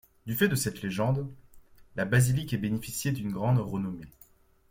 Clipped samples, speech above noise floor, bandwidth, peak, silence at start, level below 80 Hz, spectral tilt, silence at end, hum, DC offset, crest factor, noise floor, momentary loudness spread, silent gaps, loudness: under 0.1%; 31 dB; 16.5 kHz; -12 dBFS; 0.25 s; -56 dBFS; -5.5 dB/octave; 0.6 s; none; under 0.1%; 18 dB; -59 dBFS; 11 LU; none; -29 LUFS